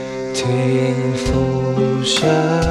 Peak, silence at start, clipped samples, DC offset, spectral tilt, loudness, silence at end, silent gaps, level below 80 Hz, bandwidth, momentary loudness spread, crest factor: -4 dBFS; 0 s; under 0.1%; under 0.1%; -5.5 dB/octave; -17 LUFS; 0 s; none; -34 dBFS; 12.5 kHz; 4 LU; 14 dB